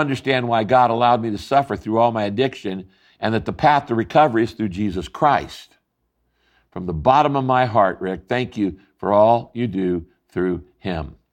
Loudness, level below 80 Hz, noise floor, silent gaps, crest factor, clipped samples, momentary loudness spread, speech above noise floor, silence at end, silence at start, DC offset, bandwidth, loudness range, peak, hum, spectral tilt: -19 LUFS; -46 dBFS; -71 dBFS; none; 16 dB; under 0.1%; 12 LU; 52 dB; 0.2 s; 0 s; under 0.1%; 11 kHz; 3 LU; -2 dBFS; none; -7 dB/octave